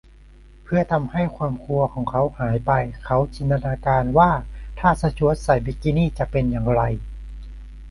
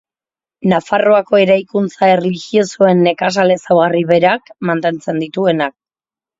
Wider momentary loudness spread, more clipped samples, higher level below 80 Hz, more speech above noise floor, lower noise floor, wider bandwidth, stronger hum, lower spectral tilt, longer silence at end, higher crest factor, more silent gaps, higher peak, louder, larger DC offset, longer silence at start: first, 12 LU vs 8 LU; neither; first, -34 dBFS vs -60 dBFS; second, 26 dB vs over 77 dB; second, -46 dBFS vs under -90 dBFS; first, 11.5 kHz vs 7.8 kHz; neither; first, -8.5 dB/octave vs -6 dB/octave; second, 0 s vs 0.7 s; first, 20 dB vs 14 dB; neither; about the same, -2 dBFS vs 0 dBFS; second, -21 LUFS vs -14 LUFS; neither; about the same, 0.65 s vs 0.6 s